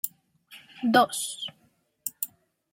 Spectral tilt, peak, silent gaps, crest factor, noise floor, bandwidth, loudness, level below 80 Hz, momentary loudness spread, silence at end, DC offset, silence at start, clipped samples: -2.5 dB/octave; -6 dBFS; none; 24 dB; -67 dBFS; 16.5 kHz; -28 LUFS; -76 dBFS; 15 LU; 0.45 s; under 0.1%; 0.05 s; under 0.1%